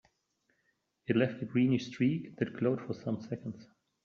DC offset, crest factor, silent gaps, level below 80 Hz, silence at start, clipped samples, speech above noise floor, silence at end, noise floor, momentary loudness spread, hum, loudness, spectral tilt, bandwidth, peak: under 0.1%; 20 dB; none; -72 dBFS; 1.1 s; under 0.1%; 46 dB; 0.4 s; -78 dBFS; 12 LU; none; -33 LUFS; -7 dB/octave; 7 kHz; -14 dBFS